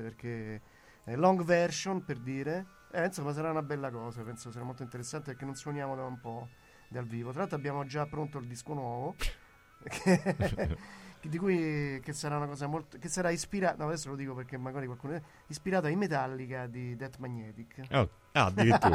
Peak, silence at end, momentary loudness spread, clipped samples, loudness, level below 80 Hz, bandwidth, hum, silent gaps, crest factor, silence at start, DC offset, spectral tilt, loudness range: -12 dBFS; 0 s; 14 LU; under 0.1%; -34 LUFS; -52 dBFS; 16 kHz; none; none; 22 dB; 0 s; under 0.1%; -5.5 dB/octave; 6 LU